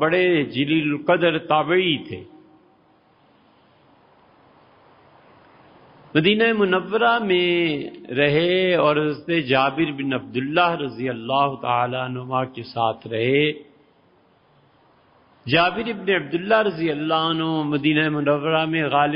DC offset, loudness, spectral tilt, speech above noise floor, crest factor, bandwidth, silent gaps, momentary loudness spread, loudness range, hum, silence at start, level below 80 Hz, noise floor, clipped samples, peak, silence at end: under 0.1%; -21 LUFS; -10.5 dB/octave; 37 dB; 18 dB; 5.4 kHz; none; 8 LU; 6 LU; none; 0 s; -62 dBFS; -58 dBFS; under 0.1%; -4 dBFS; 0 s